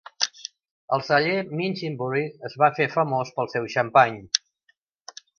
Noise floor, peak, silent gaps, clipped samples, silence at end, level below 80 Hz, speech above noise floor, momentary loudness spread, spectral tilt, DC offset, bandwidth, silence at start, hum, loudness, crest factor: -68 dBFS; 0 dBFS; 0.71-0.88 s; under 0.1%; 1 s; -68 dBFS; 45 dB; 12 LU; -4 dB/octave; under 0.1%; 7.2 kHz; 0.2 s; none; -24 LUFS; 24 dB